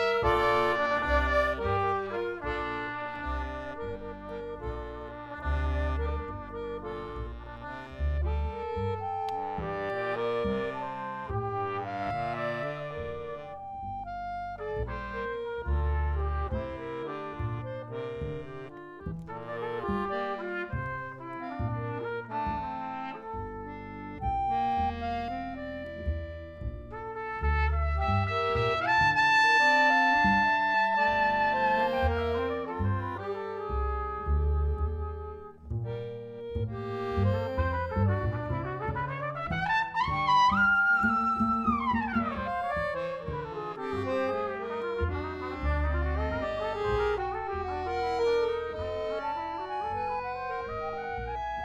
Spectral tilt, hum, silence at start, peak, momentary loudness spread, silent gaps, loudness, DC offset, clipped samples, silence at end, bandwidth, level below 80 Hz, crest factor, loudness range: -6.5 dB/octave; none; 0 s; -12 dBFS; 14 LU; none; -30 LUFS; under 0.1%; under 0.1%; 0 s; 8.8 kHz; -38 dBFS; 18 dB; 11 LU